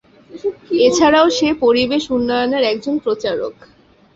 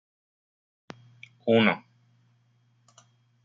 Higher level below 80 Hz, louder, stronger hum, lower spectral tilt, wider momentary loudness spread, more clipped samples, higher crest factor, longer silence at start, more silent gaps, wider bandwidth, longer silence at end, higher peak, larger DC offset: first, -50 dBFS vs -74 dBFS; first, -16 LUFS vs -25 LUFS; neither; second, -3.5 dB/octave vs -7 dB/octave; second, 13 LU vs 27 LU; neither; second, 16 dB vs 26 dB; second, 0.3 s vs 1.45 s; neither; about the same, 8 kHz vs 7.4 kHz; second, 0.65 s vs 1.65 s; first, -2 dBFS vs -6 dBFS; neither